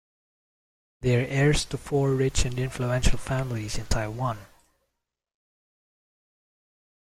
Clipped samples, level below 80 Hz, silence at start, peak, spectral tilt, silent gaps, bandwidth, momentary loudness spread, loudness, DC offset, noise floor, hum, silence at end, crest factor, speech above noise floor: under 0.1%; -36 dBFS; 1 s; -6 dBFS; -5 dB/octave; none; 15 kHz; 8 LU; -27 LUFS; under 0.1%; -82 dBFS; none; 2.7 s; 20 dB; 58 dB